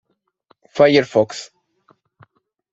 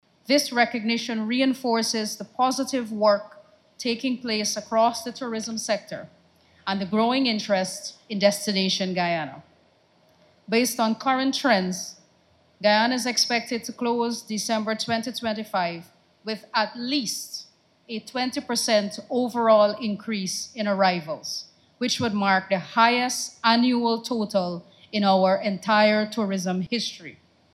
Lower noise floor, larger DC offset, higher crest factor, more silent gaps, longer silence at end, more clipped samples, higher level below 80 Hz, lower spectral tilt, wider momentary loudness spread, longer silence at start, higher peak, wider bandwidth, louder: about the same, -60 dBFS vs -61 dBFS; neither; about the same, 18 dB vs 18 dB; neither; first, 1.3 s vs 0.4 s; neither; first, -64 dBFS vs -70 dBFS; first, -5 dB/octave vs -3.5 dB/octave; first, 19 LU vs 11 LU; first, 0.75 s vs 0.3 s; first, -2 dBFS vs -6 dBFS; second, 8 kHz vs 15 kHz; first, -16 LUFS vs -24 LUFS